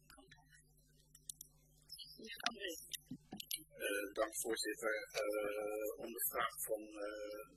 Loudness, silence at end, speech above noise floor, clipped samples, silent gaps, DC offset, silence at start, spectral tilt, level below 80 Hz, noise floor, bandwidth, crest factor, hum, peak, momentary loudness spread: -43 LUFS; 0 s; 28 dB; under 0.1%; none; under 0.1%; 0.1 s; -1.5 dB/octave; -74 dBFS; -70 dBFS; 14 kHz; 26 dB; none; -18 dBFS; 14 LU